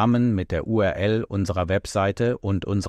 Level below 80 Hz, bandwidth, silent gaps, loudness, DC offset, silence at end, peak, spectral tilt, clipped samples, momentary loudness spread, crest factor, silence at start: -44 dBFS; 12.5 kHz; none; -23 LUFS; under 0.1%; 0 s; -10 dBFS; -7 dB/octave; under 0.1%; 4 LU; 12 dB; 0 s